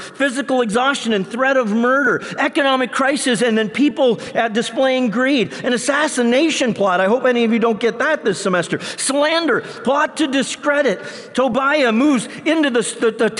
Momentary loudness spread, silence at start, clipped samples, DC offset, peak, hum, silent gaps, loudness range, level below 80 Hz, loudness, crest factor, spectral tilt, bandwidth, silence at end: 4 LU; 0 s; under 0.1%; under 0.1%; -6 dBFS; none; none; 1 LU; -62 dBFS; -17 LUFS; 10 dB; -3.5 dB/octave; 11.5 kHz; 0 s